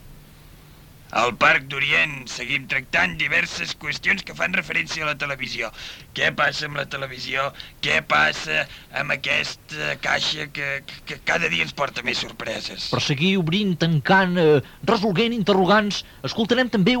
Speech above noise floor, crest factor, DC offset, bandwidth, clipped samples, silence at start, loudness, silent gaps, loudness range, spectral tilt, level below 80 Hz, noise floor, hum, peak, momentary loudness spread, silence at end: 24 dB; 18 dB; under 0.1%; 19 kHz; under 0.1%; 0.05 s; -21 LUFS; none; 4 LU; -4.5 dB/octave; -50 dBFS; -46 dBFS; none; -6 dBFS; 11 LU; 0 s